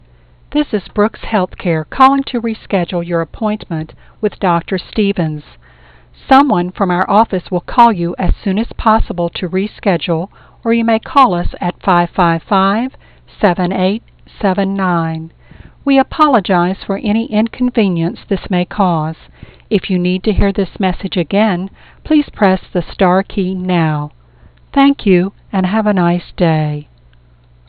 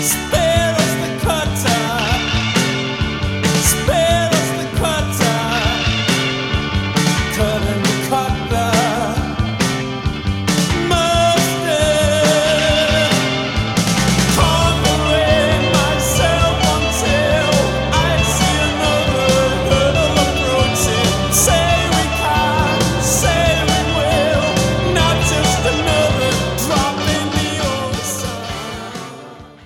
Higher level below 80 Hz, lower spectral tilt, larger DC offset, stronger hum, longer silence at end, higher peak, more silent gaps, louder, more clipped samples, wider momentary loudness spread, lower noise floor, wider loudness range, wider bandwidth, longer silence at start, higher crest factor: about the same, -30 dBFS vs -28 dBFS; first, -9 dB/octave vs -4 dB/octave; first, 0.1% vs under 0.1%; neither; first, 0.85 s vs 0.15 s; about the same, 0 dBFS vs -2 dBFS; neither; about the same, -14 LUFS vs -15 LUFS; neither; first, 10 LU vs 6 LU; first, -46 dBFS vs -36 dBFS; about the same, 3 LU vs 3 LU; second, 5.2 kHz vs 17 kHz; first, 0.5 s vs 0 s; about the same, 14 dB vs 14 dB